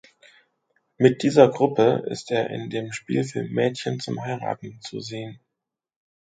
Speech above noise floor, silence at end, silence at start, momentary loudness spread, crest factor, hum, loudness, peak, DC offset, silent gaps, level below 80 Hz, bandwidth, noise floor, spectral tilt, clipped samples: 62 dB; 0.95 s; 1 s; 16 LU; 24 dB; none; -23 LUFS; 0 dBFS; under 0.1%; none; -66 dBFS; 9.4 kHz; -84 dBFS; -6 dB/octave; under 0.1%